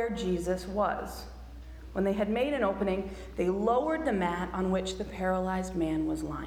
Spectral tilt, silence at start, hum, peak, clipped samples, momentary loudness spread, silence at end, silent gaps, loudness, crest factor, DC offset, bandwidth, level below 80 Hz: -6.5 dB/octave; 0 s; none; -16 dBFS; under 0.1%; 11 LU; 0 s; none; -31 LUFS; 16 dB; under 0.1%; 16 kHz; -46 dBFS